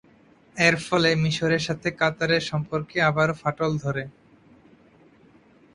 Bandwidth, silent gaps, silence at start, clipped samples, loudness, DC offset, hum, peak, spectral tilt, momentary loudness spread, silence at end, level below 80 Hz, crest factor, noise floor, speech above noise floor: 11 kHz; none; 0.55 s; under 0.1%; -23 LUFS; under 0.1%; none; -4 dBFS; -5 dB/octave; 8 LU; 1.65 s; -56 dBFS; 22 dB; -56 dBFS; 32 dB